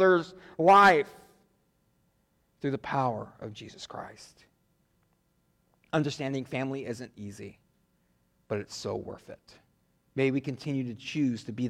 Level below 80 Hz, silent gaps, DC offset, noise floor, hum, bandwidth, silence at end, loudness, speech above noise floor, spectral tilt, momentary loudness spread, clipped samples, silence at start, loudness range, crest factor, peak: -68 dBFS; none; under 0.1%; -71 dBFS; none; 15 kHz; 0 s; -28 LUFS; 43 dB; -6 dB/octave; 22 LU; under 0.1%; 0 s; 12 LU; 20 dB; -10 dBFS